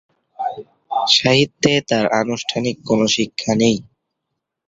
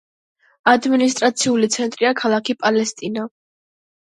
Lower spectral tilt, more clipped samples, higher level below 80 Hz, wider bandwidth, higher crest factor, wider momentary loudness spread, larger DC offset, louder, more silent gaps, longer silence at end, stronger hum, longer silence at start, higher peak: about the same, -4 dB/octave vs -3 dB/octave; neither; first, -54 dBFS vs -70 dBFS; second, 7.8 kHz vs 11.5 kHz; about the same, 20 dB vs 18 dB; about the same, 13 LU vs 11 LU; neither; about the same, -17 LUFS vs -18 LUFS; neither; about the same, 0.85 s vs 0.8 s; neither; second, 0.4 s vs 0.65 s; about the same, 0 dBFS vs 0 dBFS